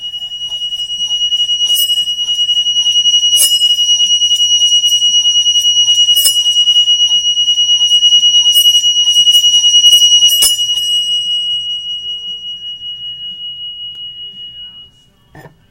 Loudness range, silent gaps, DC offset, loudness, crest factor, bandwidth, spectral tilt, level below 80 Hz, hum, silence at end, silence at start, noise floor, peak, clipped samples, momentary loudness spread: 14 LU; none; under 0.1%; -7 LUFS; 12 dB; 16 kHz; 4 dB/octave; -52 dBFS; none; 0.25 s; 0 s; -46 dBFS; 0 dBFS; under 0.1%; 17 LU